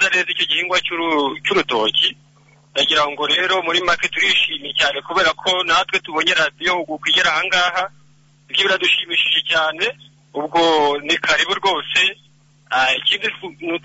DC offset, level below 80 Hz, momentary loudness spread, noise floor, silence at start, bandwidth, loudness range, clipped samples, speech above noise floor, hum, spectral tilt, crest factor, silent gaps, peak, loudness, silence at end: under 0.1%; -56 dBFS; 6 LU; -53 dBFS; 0 s; 8 kHz; 1 LU; under 0.1%; 34 dB; none; -1.5 dB/octave; 14 dB; none; -6 dBFS; -16 LUFS; 0.05 s